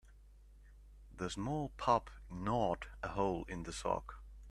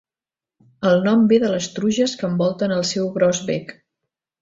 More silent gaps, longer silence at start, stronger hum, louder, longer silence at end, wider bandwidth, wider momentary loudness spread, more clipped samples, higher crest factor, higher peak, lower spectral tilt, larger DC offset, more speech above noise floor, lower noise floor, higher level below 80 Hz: neither; second, 0.05 s vs 0.8 s; first, 50 Hz at -55 dBFS vs none; second, -38 LUFS vs -19 LUFS; second, 0 s vs 0.7 s; first, 13 kHz vs 7.8 kHz; first, 15 LU vs 8 LU; neither; first, 22 dB vs 16 dB; second, -16 dBFS vs -4 dBFS; about the same, -5.5 dB/octave vs -5.5 dB/octave; neither; second, 22 dB vs over 71 dB; second, -60 dBFS vs under -90 dBFS; first, -54 dBFS vs -60 dBFS